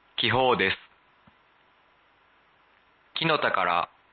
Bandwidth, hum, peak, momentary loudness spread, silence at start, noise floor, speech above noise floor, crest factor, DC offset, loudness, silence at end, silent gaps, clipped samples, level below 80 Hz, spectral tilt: 4.8 kHz; none; -10 dBFS; 8 LU; 0.2 s; -62 dBFS; 38 dB; 20 dB; under 0.1%; -25 LUFS; 0.25 s; none; under 0.1%; -60 dBFS; -8.5 dB/octave